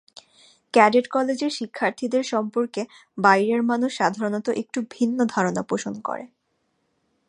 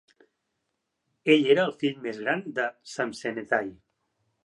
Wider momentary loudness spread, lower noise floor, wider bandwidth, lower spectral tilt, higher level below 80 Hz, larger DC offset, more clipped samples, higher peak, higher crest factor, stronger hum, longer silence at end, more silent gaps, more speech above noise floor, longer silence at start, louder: about the same, 12 LU vs 12 LU; second, -72 dBFS vs -80 dBFS; about the same, 11 kHz vs 11 kHz; about the same, -5 dB/octave vs -5 dB/octave; about the same, -72 dBFS vs -74 dBFS; neither; neither; first, -2 dBFS vs -6 dBFS; about the same, 22 dB vs 22 dB; neither; first, 1.05 s vs 0.7 s; neither; second, 49 dB vs 54 dB; second, 0.75 s vs 1.25 s; first, -23 LUFS vs -26 LUFS